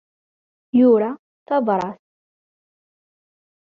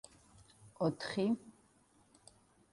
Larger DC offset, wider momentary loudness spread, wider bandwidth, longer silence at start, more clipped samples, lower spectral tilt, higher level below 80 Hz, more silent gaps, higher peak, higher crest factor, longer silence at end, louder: neither; first, 14 LU vs 7 LU; second, 6 kHz vs 11.5 kHz; about the same, 0.75 s vs 0.65 s; neither; first, -8.5 dB/octave vs -6 dB/octave; first, -68 dBFS vs -74 dBFS; first, 1.19-1.46 s vs none; first, -6 dBFS vs -22 dBFS; about the same, 18 dB vs 18 dB; first, 1.85 s vs 1.25 s; first, -19 LUFS vs -37 LUFS